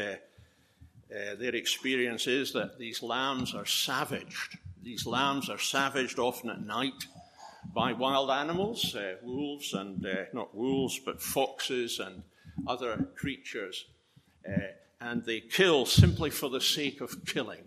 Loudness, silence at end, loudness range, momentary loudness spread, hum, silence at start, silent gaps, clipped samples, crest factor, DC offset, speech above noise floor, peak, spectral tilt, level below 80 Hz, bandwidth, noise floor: -31 LUFS; 0.05 s; 7 LU; 13 LU; none; 0 s; none; under 0.1%; 26 dB; under 0.1%; 33 dB; -6 dBFS; -4 dB/octave; -54 dBFS; 14.5 kHz; -64 dBFS